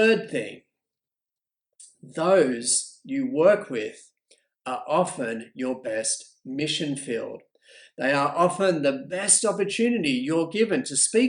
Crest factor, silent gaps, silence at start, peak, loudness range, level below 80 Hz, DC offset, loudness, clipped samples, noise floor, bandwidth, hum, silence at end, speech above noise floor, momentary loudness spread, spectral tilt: 20 dB; none; 0 s; -4 dBFS; 6 LU; -74 dBFS; under 0.1%; -24 LUFS; under 0.1%; under -90 dBFS; 11 kHz; none; 0 s; over 66 dB; 12 LU; -3 dB/octave